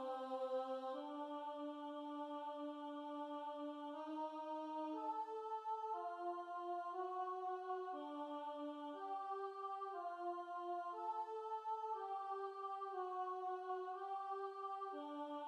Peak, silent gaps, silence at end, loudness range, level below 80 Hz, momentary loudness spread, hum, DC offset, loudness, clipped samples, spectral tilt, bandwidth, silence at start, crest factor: -34 dBFS; none; 0 s; 2 LU; under -90 dBFS; 4 LU; none; under 0.1%; -47 LUFS; under 0.1%; -3.5 dB/octave; 10.5 kHz; 0 s; 12 dB